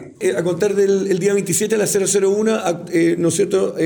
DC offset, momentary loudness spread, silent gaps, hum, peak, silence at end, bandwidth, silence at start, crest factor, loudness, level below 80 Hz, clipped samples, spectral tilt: under 0.1%; 4 LU; none; none; -6 dBFS; 0 s; over 20 kHz; 0 s; 12 dB; -17 LUFS; -62 dBFS; under 0.1%; -4.5 dB/octave